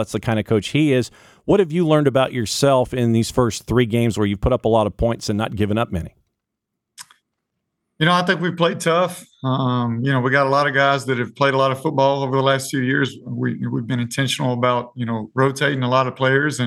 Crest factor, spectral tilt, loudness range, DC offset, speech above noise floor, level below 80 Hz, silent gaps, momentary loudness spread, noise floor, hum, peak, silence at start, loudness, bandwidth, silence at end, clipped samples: 16 dB; -5.5 dB/octave; 5 LU; under 0.1%; 62 dB; -42 dBFS; none; 7 LU; -80 dBFS; none; -4 dBFS; 0 s; -19 LUFS; 15.5 kHz; 0 s; under 0.1%